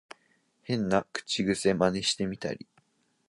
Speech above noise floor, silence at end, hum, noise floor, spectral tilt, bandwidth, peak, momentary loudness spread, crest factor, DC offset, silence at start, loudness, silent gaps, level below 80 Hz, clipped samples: 41 dB; 0.65 s; none; -69 dBFS; -4.5 dB/octave; 11.5 kHz; -10 dBFS; 11 LU; 22 dB; under 0.1%; 0.7 s; -29 LUFS; none; -60 dBFS; under 0.1%